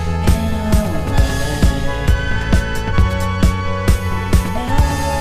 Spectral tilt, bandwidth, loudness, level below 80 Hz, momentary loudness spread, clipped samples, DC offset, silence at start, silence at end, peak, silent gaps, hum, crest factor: -6 dB/octave; 15.5 kHz; -18 LUFS; -18 dBFS; 2 LU; under 0.1%; under 0.1%; 0 s; 0 s; 0 dBFS; none; none; 14 dB